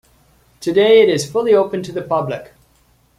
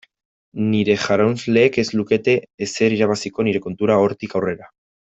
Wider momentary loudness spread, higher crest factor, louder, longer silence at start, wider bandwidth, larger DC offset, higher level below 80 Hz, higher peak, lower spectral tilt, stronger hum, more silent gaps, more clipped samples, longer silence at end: first, 15 LU vs 8 LU; about the same, 14 dB vs 16 dB; first, -15 LUFS vs -19 LUFS; about the same, 0.6 s vs 0.55 s; first, 13 kHz vs 8.2 kHz; neither; about the same, -56 dBFS vs -58 dBFS; about the same, -2 dBFS vs -2 dBFS; about the same, -5 dB/octave vs -5.5 dB/octave; neither; second, none vs 2.54-2.58 s; neither; first, 0.75 s vs 0.45 s